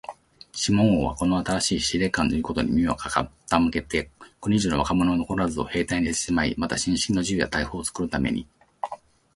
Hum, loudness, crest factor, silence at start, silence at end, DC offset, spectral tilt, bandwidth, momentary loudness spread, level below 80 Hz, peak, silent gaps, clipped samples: none; -24 LUFS; 20 dB; 0.1 s; 0.4 s; under 0.1%; -4.5 dB/octave; 11.5 kHz; 10 LU; -42 dBFS; -4 dBFS; none; under 0.1%